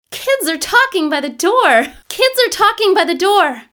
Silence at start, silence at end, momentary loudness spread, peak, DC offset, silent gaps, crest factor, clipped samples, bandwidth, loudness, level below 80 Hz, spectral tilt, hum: 0.1 s; 0.1 s; 5 LU; 0 dBFS; under 0.1%; none; 14 dB; under 0.1%; over 20 kHz; -13 LUFS; -54 dBFS; -1 dB/octave; none